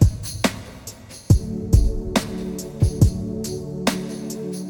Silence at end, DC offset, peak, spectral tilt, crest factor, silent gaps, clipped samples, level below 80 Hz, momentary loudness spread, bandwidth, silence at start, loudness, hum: 0 s; under 0.1%; -2 dBFS; -6 dB/octave; 18 dB; none; under 0.1%; -26 dBFS; 14 LU; 19 kHz; 0 s; -23 LUFS; none